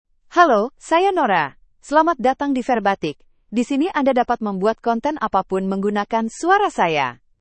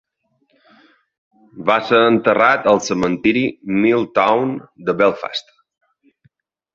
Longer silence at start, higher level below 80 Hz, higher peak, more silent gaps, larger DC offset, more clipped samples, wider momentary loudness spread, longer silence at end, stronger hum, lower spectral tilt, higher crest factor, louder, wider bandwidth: second, 0.3 s vs 1.55 s; about the same, -54 dBFS vs -56 dBFS; about the same, 0 dBFS vs -2 dBFS; neither; neither; neither; second, 7 LU vs 11 LU; second, 0.25 s vs 1.35 s; neither; about the same, -5.5 dB/octave vs -5 dB/octave; about the same, 20 dB vs 16 dB; second, -19 LUFS vs -16 LUFS; first, 8.8 kHz vs 7.8 kHz